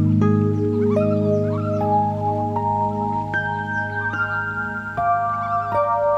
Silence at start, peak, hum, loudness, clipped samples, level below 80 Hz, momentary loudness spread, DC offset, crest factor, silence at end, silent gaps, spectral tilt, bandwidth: 0 s; -6 dBFS; none; -21 LUFS; under 0.1%; -50 dBFS; 5 LU; under 0.1%; 14 dB; 0 s; none; -9 dB/octave; 7.6 kHz